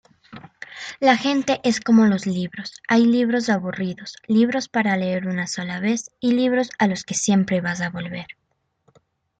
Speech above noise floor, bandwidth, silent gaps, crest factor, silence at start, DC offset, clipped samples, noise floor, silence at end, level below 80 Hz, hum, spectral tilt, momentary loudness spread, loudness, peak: 45 dB; 9.2 kHz; none; 18 dB; 0.3 s; under 0.1%; under 0.1%; -65 dBFS; 1.05 s; -62 dBFS; none; -5 dB/octave; 15 LU; -21 LUFS; -2 dBFS